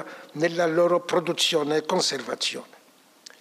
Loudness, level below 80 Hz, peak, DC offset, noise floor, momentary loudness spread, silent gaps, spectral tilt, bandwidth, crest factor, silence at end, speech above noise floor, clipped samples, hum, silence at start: -24 LUFS; -80 dBFS; -10 dBFS; under 0.1%; -56 dBFS; 6 LU; none; -3 dB/octave; 15.5 kHz; 16 dB; 0.75 s; 32 dB; under 0.1%; none; 0 s